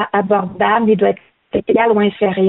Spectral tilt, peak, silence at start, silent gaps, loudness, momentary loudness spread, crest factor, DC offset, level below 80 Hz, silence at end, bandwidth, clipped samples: -5 dB/octave; -2 dBFS; 0 s; none; -15 LUFS; 9 LU; 12 dB; under 0.1%; -52 dBFS; 0 s; 4.1 kHz; under 0.1%